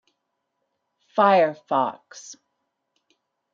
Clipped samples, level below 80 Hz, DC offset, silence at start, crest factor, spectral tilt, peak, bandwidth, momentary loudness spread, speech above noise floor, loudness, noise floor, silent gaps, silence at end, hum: under 0.1%; -82 dBFS; under 0.1%; 1.15 s; 22 dB; -5 dB/octave; -4 dBFS; 7.6 kHz; 24 LU; 57 dB; -21 LUFS; -78 dBFS; none; 1.2 s; none